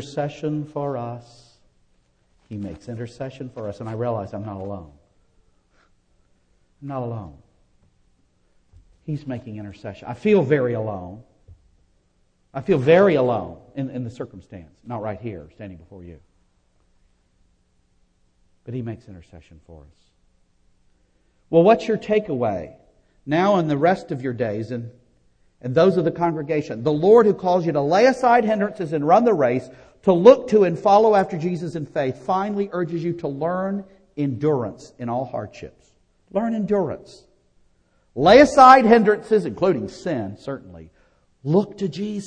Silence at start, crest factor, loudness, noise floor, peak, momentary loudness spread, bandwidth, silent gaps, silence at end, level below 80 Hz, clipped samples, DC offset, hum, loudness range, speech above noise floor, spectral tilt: 0 s; 22 dB; -20 LUFS; -63 dBFS; 0 dBFS; 20 LU; 9.6 kHz; none; 0 s; -54 dBFS; under 0.1%; under 0.1%; none; 22 LU; 43 dB; -7 dB/octave